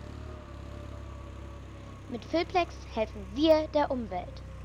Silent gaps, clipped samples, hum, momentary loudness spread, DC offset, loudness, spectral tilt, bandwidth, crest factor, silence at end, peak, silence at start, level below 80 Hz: none; under 0.1%; none; 20 LU; under 0.1%; -30 LUFS; -6.5 dB/octave; 17 kHz; 20 dB; 0 s; -12 dBFS; 0 s; -46 dBFS